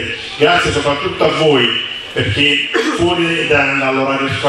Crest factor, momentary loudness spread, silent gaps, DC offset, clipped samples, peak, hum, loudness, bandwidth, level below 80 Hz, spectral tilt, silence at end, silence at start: 14 dB; 6 LU; none; under 0.1%; under 0.1%; 0 dBFS; none; -13 LUFS; 12.5 kHz; -40 dBFS; -4.5 dB/octave; 0 s; 0 s